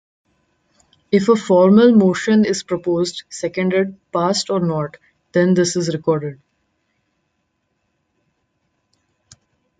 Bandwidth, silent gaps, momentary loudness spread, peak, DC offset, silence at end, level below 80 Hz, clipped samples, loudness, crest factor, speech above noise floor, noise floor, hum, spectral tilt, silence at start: 9.4 kHz; none; 12 LU; -2 dBFS; under 0.1%; 3.45 s; -60 dBFS; under 0.1%; -17 LUFS; 16 dB; 54 dB; -70 dBFS; none; -6 dB/octave; 1.1 s